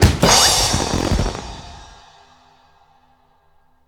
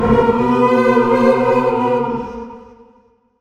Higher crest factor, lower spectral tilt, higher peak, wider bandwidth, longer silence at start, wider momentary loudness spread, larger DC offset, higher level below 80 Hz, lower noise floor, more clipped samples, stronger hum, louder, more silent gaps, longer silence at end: about the same, 18 dB vs 14 dB; second, -3 dB/octave vs -7.5 dB/octave; about the same, 0 dBFS vs 0 dBFS; first, over 20 kHz vs 9.2 kHz; about the same, 0 s vs 0 s; first, 24 LU vs 14 LU; neither; first, -28 dBFS vs -38 dBFS; about the same, -56 dBFS vs -53 dBFS; neither; neither; about the same, -15 LUFS vs -14 LUFS; neither; first, 2.05 s vs 0.75 s